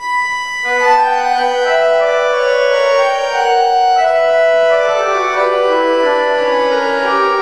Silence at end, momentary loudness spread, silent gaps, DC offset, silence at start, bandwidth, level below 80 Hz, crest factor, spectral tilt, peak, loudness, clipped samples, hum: 0 s; 3 LU; none; 0.6%; 0 s; 11.5 kHz; -54 dBFS; 12 dB; -1.5 dB/octave; -2 dBFS; -13 LUFS; under 0.1%; none